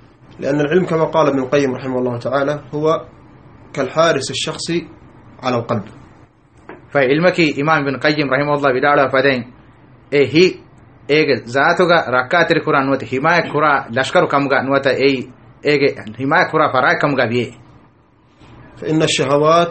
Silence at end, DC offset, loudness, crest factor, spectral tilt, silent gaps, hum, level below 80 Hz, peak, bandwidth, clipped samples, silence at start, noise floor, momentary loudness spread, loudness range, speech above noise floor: 0 s; 0.1%; -16 LUFS; 16 dB; -5 dB/octave; none; none; -52 dBFS; 0 dBFS; 8.8 kHz; under 0.1%; 0.4 s; -51 dBFS; 9 LU; 5 LU; 36 dB